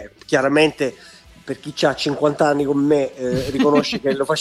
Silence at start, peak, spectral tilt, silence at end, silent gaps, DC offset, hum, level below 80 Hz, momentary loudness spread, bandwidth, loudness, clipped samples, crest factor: 0 s; -2 dBFS; -5 dB/octave; 0 s; none; under 0.1%; none; -50 dBFS; 9 LU; 13.5 kHz; -19 LUFS; under 0.1%; 16 dB